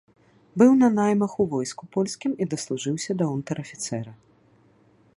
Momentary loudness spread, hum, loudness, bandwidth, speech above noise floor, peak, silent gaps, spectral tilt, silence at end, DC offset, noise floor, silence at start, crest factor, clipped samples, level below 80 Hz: 13 LU; none; -24 LUFS; 11.5 kHz; 36 dB; -4 dBFS; none; -6 dB/octave; 1.05 s; under 0.1%; -59 dBFS; 0.55 s; 20 dB; under 0.1%; -66 dBFS